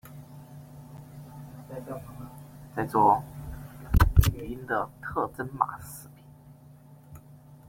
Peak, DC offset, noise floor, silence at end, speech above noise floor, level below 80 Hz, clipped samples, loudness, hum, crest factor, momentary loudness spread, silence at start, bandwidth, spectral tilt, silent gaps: -4 dBFS; under 0.1%; -52 dBFS; 0.15 s; 23 dB; -36 dBFS; under 0.1%; -27 LUFS; none; 24 dB; 25 LU; 0.05 s; 16.5 kHz; -6.5 dB/octave; none